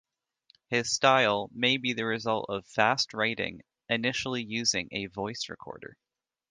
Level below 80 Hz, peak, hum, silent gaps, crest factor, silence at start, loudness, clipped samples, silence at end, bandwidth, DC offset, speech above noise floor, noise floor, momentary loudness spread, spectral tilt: -66 dBFS; -8 dBFS; none; none; 22 dB; 0.7 s; -28 LUFS; under 0.1%; 0.65 s; 11 kHz; under 0.1%; 39 dB; -68 dBFS; 13 LU; -3 dB/octave